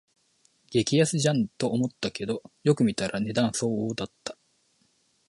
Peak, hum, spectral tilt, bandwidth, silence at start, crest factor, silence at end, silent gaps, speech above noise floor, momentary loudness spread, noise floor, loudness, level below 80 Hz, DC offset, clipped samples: -10 dBFS; none; -5 dB/octave; 11.5 kHz; 0.7 s; 18 dB; 0.95 s; none; 42 dB; 10 LU; -68 dBFS; -27 LUFS; -62 dBFS; under 0.1%; under 0.1%